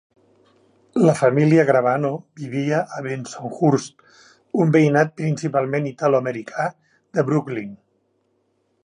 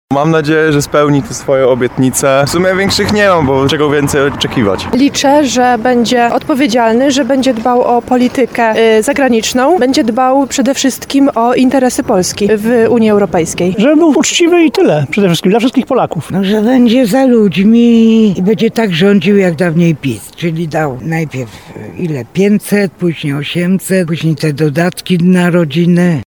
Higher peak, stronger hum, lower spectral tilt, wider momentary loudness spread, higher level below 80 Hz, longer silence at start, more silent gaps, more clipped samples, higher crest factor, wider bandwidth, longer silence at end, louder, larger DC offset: about the same, -2 dBFS vs 0 dBFS; neither; first, -7.5 dB/octave vs -5.5 dB/octave; first, 14 LU vs 7 LU; second, -68 dBFS vs -42 dBFS; first, 0.95 s vs 0.1 s; neither; neither; first, 20 dB vs 10 dB; second, 10.5 kHz vs 19 kHz; first, 1.1 s vs 0.05 s; second, -20 LUFS vs -10 LUFS; second, under 0.1% vs 0.2%